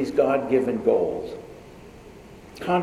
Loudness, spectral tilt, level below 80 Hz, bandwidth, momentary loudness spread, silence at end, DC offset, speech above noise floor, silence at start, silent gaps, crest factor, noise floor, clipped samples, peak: -23 LUFS; -7 dB/octave; -54 dBFS; 14 kHz; 24 LU; 0 s; under 0.1%; 22 dB; 0 s; none; 18 dB; -45 dBFS; under 0.1%; -6 dBFS